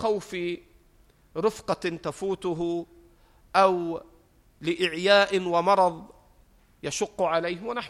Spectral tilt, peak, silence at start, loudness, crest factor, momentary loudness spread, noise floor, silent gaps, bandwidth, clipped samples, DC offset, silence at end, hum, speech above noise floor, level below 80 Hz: -4 dB/octave; -6 dBFS; 0 s; -26 LUFS; 20 dB; 14 LU; -59 dBFS; none; 14 kHz; under 0.1%; under 0.1%; 0 s; none; 34 dB; -60 dBFS